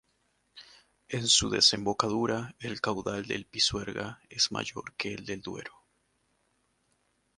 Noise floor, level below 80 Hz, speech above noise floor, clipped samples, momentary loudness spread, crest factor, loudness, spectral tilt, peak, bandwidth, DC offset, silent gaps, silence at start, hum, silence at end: -74 dBFS; -58 dBFS; 43 dB; under 0.1%; 15 LU; 24 dB; -28 LUFS; -2.5 dB/octave; -8 dBFS; 11.5 kHz; under 0.1%; none; 0.55 s; none; 1.7 s